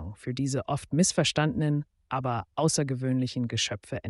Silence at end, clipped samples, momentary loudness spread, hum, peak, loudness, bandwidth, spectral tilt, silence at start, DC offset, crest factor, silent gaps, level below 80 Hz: 0 s; under 0.1%; 8 LU; none; -10 dBFS; -28 LUFS; 11.5 kHz; -4.5 dB/octave; 0 s; under 0.1%; 18 dB; none; -56 dBFS